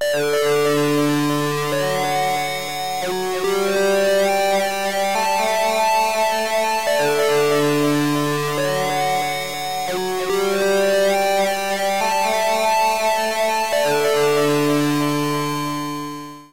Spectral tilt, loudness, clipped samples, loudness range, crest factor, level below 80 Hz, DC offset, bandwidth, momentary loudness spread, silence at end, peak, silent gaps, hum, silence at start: -4 dB/octave; -19 LUFS; under 0.1%; 2 LU; 10 dB; -56 dBFS; 1%; 16 kHz; 6 LU; 0 s; -10 dBFS; none; none; 0 s